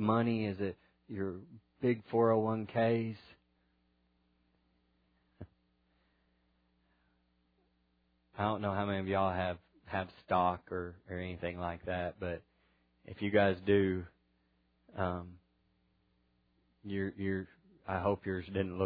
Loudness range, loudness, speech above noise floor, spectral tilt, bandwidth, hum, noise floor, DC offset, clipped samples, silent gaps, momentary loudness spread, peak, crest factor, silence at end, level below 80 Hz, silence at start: 7 LU; -35 LUFS; 41 dB; -6 dB/octave; 5 kHz; none; -75 dBFS; under 0.1%; under 0.1%; none; 17 LU; -14 dBFS; 22 dB; 0 s; -66 dBFS; 0 s